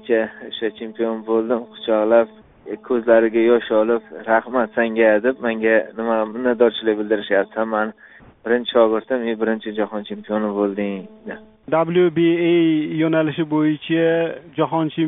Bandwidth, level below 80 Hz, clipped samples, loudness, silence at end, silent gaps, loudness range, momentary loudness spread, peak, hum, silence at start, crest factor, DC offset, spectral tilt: 3.9 kHz; -62 dBFS; under 0.1%; -19 LUFS; 0 s; none; 3 LU; 10 LU; -2 dBFS; none; 0.05 s; 18 dB; under 0.1%; -4.5 dB/octave